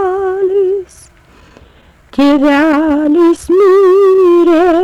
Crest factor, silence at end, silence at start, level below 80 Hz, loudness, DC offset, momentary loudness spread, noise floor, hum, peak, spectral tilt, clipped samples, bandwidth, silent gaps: 6 dB; 0 s; 0 s; -44 dBFS; -9 LUFS; under 0.1%; 7 LU; -43 dBFS; none; -4 dBFS; -5.5 dB/octave; under 0.1%; 12 kHz; none